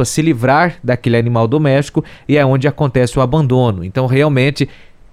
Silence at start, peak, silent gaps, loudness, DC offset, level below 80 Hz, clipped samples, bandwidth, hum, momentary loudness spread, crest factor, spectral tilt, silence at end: 0 s; 0 dBFS; none; -14 LUFS; under 0.1%; -38 dBFS; under 0.1%; 14 kHz; none; 6 LU; 12 dB; -6.5 dB/octave; 0.4 s